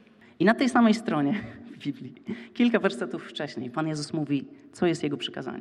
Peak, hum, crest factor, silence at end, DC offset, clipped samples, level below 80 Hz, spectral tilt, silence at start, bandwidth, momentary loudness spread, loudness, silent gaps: -6 dBFS; none; 20 dB; 0 s; under 0.1%; under 0.1%; -70 dBFS; -6 dB/octave; 0.4 s; 11 kHz; 16 LU; -27 LUFS; none